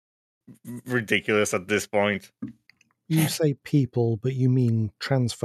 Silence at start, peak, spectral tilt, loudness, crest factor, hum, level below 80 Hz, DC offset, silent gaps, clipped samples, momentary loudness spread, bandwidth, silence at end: 0.5 s; -6 dBFS; -5.5 dB/octave; -24 LUFS; 20 dB; none; -66 dBFS; under 0.1%; none; under 0.1%; 15 LU; 14 kHz; 0.05 s